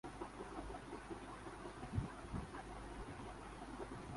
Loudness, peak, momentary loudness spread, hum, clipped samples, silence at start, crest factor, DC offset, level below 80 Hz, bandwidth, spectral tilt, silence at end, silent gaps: -50 LUFS; -28 dBFS; 6 LU; none; under 0.1%; 0.05 s; 20 dB; under 0.1%; -56 dBFS; 11.5 kHz; -6 dB/octave; 0 s; none